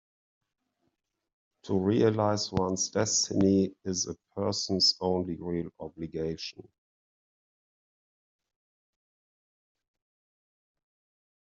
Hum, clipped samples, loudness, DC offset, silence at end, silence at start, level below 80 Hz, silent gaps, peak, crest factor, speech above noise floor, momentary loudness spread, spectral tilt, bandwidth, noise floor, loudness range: none; under 0.1%; -28 LUFS; under 0.1%; 4.85 s; 1.65 s; -64 dBFS; none; -12 dBFS; 20 dB; 51 dB; 11 LU; -4 dB/octave; 8 kHz; -79 dBFS; 15 LU